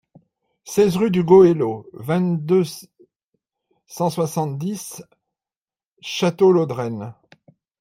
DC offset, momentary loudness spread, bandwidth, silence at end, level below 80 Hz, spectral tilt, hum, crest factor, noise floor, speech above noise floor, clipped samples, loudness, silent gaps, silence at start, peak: under 0.1%; 21 LU; 16 kHz; 0.7 s; -60 dBFS; -6.5 dB/octave; none; 18 dB; under -90 dBFS; over 72 dB; under 0.1%; -19 LUFS; 3.16-3.33 s, 5.57-5.61 s, 5.87-5.96 s; 0.65 s; -2 dBFS